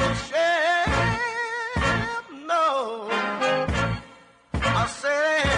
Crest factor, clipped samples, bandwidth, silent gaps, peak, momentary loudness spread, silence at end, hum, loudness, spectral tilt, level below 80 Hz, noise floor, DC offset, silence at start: 14 dB; under 0.1%; 11 kHz; none; -10 dBFS; 7 LU; 0 s; none; -24 LUFS; -4.5 dB/octave; -40 dBFS; -50 dBFS; under 0.1%; 0 s